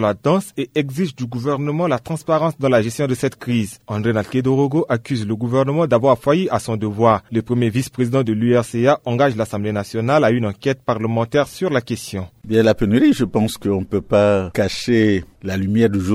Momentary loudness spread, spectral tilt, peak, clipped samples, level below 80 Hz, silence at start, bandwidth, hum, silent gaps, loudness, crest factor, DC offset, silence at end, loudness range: 7 LU; -6.5 dB/octave; -2 dBFS; under 0.1%; -48 dBFS; 0 s; 15.5 kHz; none; none; -18 LUFS; 16 dB; under 0.1%; 0 s; 2 LU